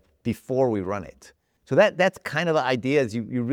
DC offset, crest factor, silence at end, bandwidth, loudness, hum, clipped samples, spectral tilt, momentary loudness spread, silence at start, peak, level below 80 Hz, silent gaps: under 0.1%; 18 dB; 0 s; 17 kHz; -24 LUFS; none; under 0.1%; -6 dB/octave; 11 LU; 0.25 s; -6 dBFS; -60 dBFS; none